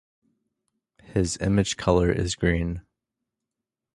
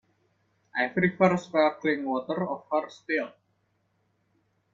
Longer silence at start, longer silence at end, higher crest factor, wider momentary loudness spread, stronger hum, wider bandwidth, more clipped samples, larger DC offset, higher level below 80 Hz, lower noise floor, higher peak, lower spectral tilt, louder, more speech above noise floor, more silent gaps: first, 1.1 s vs 0.75 s; second, 1.15 s vs 1.45 s; about the same, 22 dB vs 22 dB; about the same, 9 LU vs 8 LU; neither; first, 11.5 kHz vs 7.4 kHz; neither; neither; first, -40 dBFS vs -70 dBFS; first, -86 dBFS vs -72 dBFS; about the same, -4 dBFS vs -6 dBFS; second, -5.5 dB/octave vs -7 dB/octave; first, -24 LUFS vs -27 LUFS; first, 63 dB vs 46 dB; neither